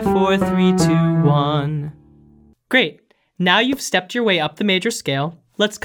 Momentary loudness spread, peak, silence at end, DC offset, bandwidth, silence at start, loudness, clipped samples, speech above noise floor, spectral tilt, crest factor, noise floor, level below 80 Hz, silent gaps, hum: 8 LU; 0 dBFS; 0.05 s; under 0.1%; 18 kHz; 0 s; -18 LUFS; under 0.1%; 33 dB; -5 dB/octave; 18 dB; -51 dBFS; -48 dBFS; none; none